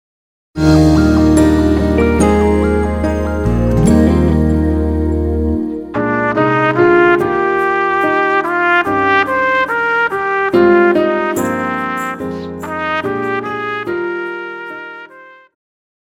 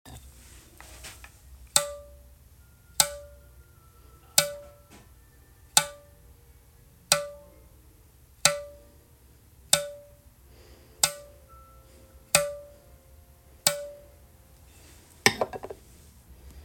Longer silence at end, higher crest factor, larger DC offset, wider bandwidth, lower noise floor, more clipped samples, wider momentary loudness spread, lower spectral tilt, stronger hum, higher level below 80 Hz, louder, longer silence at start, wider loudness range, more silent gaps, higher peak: first, 0.75 s vs 0 s; second, 14 dB vs 32 dB; neither; about the same, 16 kHz vs 17 kHz; second, -39 dBFS vs -56 dBFS; neither; second, 11 LU vs 24 LU; first, -7 dB/octave vs -0.5 dB/octave; neither; first, -24 dBFS vs -54 dBFS; first, -13 LUFS vs -26 LUFS; first, 0.55 s vs 0.05 s; first, 7 LU vs 2 LU; neither; about the same, 0 dBFS vs 0 dBFS